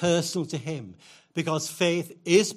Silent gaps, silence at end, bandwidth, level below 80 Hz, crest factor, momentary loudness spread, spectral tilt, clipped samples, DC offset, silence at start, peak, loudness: none; 0 s; 15.5 kHz; -68 dBFS; 20 dB; 13 LU; -4.5 dB/octave; under 0.1%; under 0.1%; 0 s; -6 dBFS; -27 LUFS